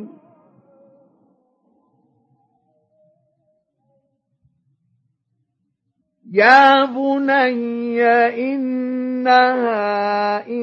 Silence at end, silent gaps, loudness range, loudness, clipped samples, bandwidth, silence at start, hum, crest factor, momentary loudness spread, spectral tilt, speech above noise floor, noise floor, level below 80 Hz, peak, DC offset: 0 s; none; 3 LU; -16 LUFS; under 0.1%; 7.2 kHz; 0 s; none; 20 dB; 12 LU; -5 dB/octave; 57 dB; -72 dBFS; -80 dBFS; 0 dBFS; under 0.1%